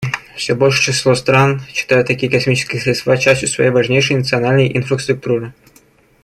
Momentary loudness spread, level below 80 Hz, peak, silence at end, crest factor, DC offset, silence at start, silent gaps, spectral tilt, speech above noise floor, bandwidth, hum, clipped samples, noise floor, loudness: 8 LU; -48 dBFS; 0 dBFS; 0.75 s; 14 dB; under 0.1%; 0 s; none; -4.5 dB/octave; 36 dB; 12.5 kHz; none; under 0.1%; -50 dBFS; -14 LUFS